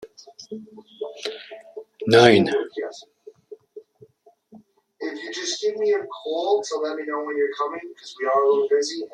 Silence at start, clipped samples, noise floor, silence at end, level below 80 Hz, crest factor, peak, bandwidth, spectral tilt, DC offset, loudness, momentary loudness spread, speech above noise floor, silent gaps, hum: 0 s; under 0.1%; -55 dBFS; 0.05 s; -66 dBFS; 24 dB; 0 dBFS; 11 kHz; -4.5 dB/octave; under 0.1%; -22 LUFS; 23 LU; 34 dB; none; none